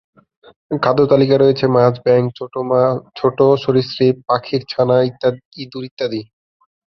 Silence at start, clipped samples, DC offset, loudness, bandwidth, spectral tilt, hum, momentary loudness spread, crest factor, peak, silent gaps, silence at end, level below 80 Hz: 0.7 s; under 0.1%; under 0.1%; -16 LUFS; 6.2 kHz; -8.5 dB/octave; none; 12 LU; 16 dB; 0 dBFS; 5.45-5.51 s, 5.91-5.97 s; 0.7 s; -56 dBFS